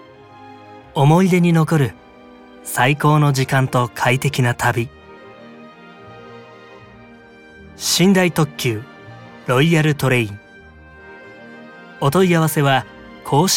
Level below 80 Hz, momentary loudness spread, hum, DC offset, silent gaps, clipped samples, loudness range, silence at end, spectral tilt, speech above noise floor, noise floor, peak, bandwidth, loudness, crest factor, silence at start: -54 dBFS; 25 LU; none; under 0.1%; none; under 0.1%; 6 LU; 0 s; -5 dB/octave; 28 dB; -43 dBFS; 0 dBFS; 17.5 kHz; -17 LUFS; 18 dB; 0.4 s